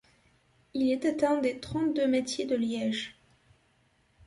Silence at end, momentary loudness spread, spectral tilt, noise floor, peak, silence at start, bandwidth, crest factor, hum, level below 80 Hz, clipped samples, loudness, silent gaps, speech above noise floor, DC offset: 1.15 s; 7 LU; -4.5 dB/octave; -68 dBFS; -12 dBFS; 0.75 s; 11.5 kHz; 18 dB; none; -64 dBFS; under 0.1%; -29 LUFS; none; 40 dB; under 0.1%